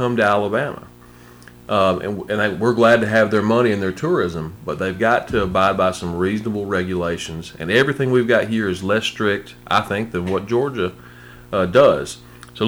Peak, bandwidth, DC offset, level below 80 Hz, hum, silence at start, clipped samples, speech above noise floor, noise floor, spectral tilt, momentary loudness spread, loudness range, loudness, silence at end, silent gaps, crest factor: -2 dBFS; over 20 kHz; under 0.1%; -46 dBFS; 60 Hz at -50 dBFS; 0 s; under 0.1%; 25 dB; -44 dBFS; -6 dB/octave; 11 LU; 3 LU; -19 LUFS; 0 s; none; 18 dB